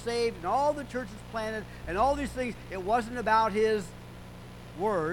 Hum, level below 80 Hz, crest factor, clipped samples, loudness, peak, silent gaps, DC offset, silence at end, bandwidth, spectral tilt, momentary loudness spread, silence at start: none; -48 dBFS; 18 dB; under 0.1%; -30 LUFS; -12 dBFS; none; under 0.1%; 0 s; 18 kHz; -5 dB/octave; 20 LU; 0 s